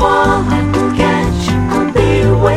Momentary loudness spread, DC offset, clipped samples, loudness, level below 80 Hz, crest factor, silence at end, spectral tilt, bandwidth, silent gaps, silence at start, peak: 3 LU; under 0.1%; under 0.1%; -13 LUFS; -24 dBFS; 12 dB; 0 s; -6.5 dB/octave; 13.5 kHz; none; 0 s; 0 dBFS